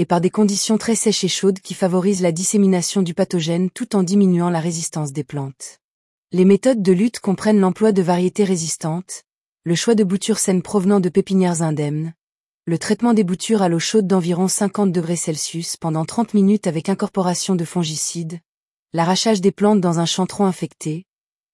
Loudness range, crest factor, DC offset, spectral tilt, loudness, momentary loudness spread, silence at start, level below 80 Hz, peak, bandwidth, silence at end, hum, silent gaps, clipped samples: 3 LU; 14 dB; under 0.1%; -5 dB/octave; -18 LUFS; 10 LU; 0 s; -62 dBFS; -4 dBFS; 12 kHz; 0.5 s; none; 5.84-6.23 s, 9.32-9.56 s, 12.23-12.61 s, 18.46-18.86 s; under 0.1%